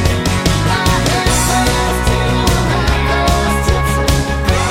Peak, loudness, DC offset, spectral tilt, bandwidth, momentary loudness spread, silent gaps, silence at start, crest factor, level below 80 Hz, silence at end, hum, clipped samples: 0 dBFS; -14 LUFS; under 0.1%; -4.5 dB/octave; 16.5 kHz; 2 LU; none; 0 s; 12 dB; -20 dBFS; 0 s; none; under 0.1%